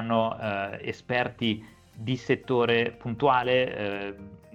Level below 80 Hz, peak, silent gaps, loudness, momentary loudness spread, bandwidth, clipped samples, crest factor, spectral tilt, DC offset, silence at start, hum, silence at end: -60 dBFS; -8 dBFS; none; -27 LUFS; 12 LU; 8.2 kHz; under 0.1%; 18 dB; -6.5 dB/octave; under 0.1%; 0 s; none; 0.2 s